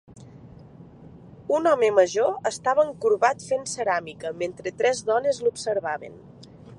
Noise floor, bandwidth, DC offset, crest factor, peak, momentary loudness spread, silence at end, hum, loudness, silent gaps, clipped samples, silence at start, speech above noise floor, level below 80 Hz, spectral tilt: -46 dBFS; 11.5 kHz; under 0.1%; 20 dB; -6 dBFS; 11 LU; 0 s; none; -24 LUFS; none; under 0.1%; 0.1 s; 23 dB; -62 dBFS; -3.5 dB/octave